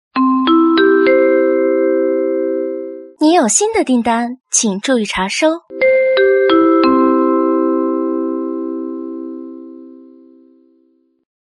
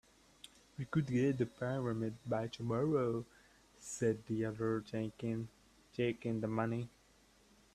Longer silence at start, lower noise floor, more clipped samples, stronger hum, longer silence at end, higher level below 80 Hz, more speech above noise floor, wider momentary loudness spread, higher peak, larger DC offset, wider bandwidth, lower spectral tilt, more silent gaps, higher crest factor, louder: second, 0.15 s vs 0.8 s; second, -57 dBFS vs -68 dBFS; neither; neither; first, 1.55 s vs 0.85 s; first, -54 dBFS vs -68 dBFS; first, 42 dB vs 31 dB; second, 13 LU vs 16 LU; first, 0 dBFS vs -20 dBFS; neither; second, 11.5 kHz vs 13 kHz; second, -3 dB/octave vs -7 dB/octave; neither; about the same, 14 dB vs 18 dB; first, -14 LUFS vs -38 LUFS